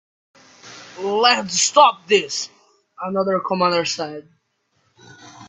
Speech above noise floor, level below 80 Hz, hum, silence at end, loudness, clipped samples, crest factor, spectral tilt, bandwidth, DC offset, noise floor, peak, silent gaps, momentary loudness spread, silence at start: 49 dB; -68 dBFS; none; 0 s; -18 LUFS; under 0.1%; 20 dB; -2 dB/octave; 8.6 kHz; under 0.1%; -67 dBFS; 0 dBFS; none; 18 LU; 0.65 s